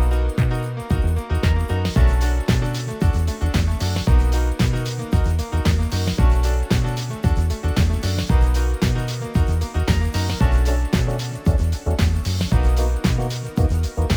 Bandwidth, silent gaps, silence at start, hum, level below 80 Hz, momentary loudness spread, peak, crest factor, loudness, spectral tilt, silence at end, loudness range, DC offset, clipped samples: over 20 kHz; none; 0 s; none; -22 dBFS; 4 LU; -4 dBFS; 14 dB; -21 LUFS; -6 dB/octave; 0 s; 1 LU; under 0.1%; under 0.1%